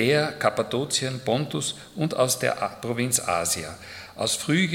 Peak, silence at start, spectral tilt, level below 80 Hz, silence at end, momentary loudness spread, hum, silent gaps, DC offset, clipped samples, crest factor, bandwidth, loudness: -4 dBFS; 0 s; -3.5 dB/octave; -62 dBFS; 0 s; 7 LU; none; none; under 0.1%; under 0.1%; 20 dB; 18 kHz; -25 LUFS